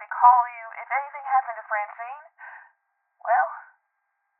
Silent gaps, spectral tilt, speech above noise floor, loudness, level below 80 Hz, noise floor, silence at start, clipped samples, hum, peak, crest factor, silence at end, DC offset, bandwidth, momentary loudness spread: none; 7 dB/octave; 53 dB; -23 LUFS; under -90 dBFS; -76 dBFS; 0 s; under 0.1%; none; -4 dBFS; 22 dB; 0.8 s; under 0.1%; 3.1 kHz; 25 LU